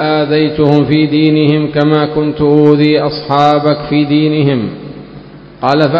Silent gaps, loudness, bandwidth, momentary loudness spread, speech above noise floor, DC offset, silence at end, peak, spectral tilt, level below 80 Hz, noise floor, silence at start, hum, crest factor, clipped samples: none; -11 LUFS; 6.6 kHz; 8 LU; 23 dB; under 0.1%; 0 s; 0 dBFS; -8.5 dB/octave; -42 dBFS; -32 dBFS; 0 s; none; 10 dB; 0.5%